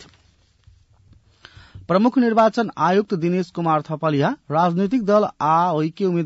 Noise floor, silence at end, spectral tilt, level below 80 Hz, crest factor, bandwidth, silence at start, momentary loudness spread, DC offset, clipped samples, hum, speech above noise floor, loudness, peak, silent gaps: -58 dBFS; 0 s; -7.5 dB/octave; -58 dBFS; 14 dB; 8 kHz; 0 s; 5 LU; under 0.1%; under 0.1%; none; 39 dB; -19 LUFS; -6 dBFS; none